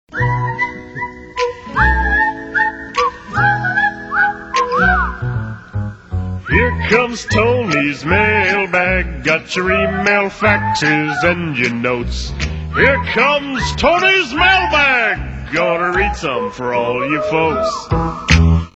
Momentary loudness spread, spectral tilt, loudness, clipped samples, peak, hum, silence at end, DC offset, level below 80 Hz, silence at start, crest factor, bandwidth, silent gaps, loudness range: 10 LU; -5 dB/octave; -15 LUFS; under 0.1%; 0 dBFS; none; 0.05 s; under 0.1%; -28 dBFS; 0.1 s; 16 dB; 8.2 kHz; none; 4 LU